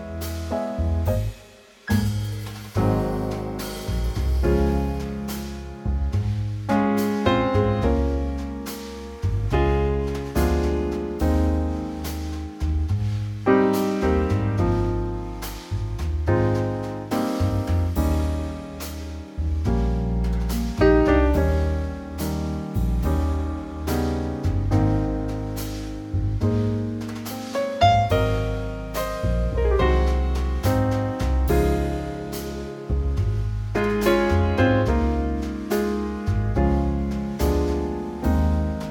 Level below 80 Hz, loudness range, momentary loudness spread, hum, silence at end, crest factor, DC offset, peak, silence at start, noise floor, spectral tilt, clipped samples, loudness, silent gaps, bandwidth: -28 dBFS; 3 LU; 10 LU; none; 0 s; 18 dB; under 0.1%; -4 dBFS; 0 s; -48 dBFS; -7 dB/octave; under 0.1%; -24 LUFS; none; 17.5 kHz